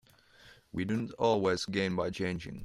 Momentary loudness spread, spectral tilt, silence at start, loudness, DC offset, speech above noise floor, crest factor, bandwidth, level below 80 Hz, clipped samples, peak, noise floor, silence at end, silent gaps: 8 LU; -5.5 dB/octave; 0.45 s; -32 LUFS; under 0.1%; 28 dB; 18 dB; 13 kHz; -62 dBFS; under 0.1%; -16 dBFS; -59 dBFS; 0 s; none